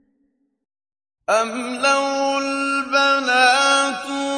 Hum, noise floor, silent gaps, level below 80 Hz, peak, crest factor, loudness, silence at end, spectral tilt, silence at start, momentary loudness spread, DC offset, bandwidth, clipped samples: none; -67 dBFS; none; -68 dBFS; -4 dBFS; 18 dB; -18 LUFS; 0 s; -0.5 dB/octave; 1.3 s; 8 LU; under 0.1%; 10.5 kHz; under 0.1%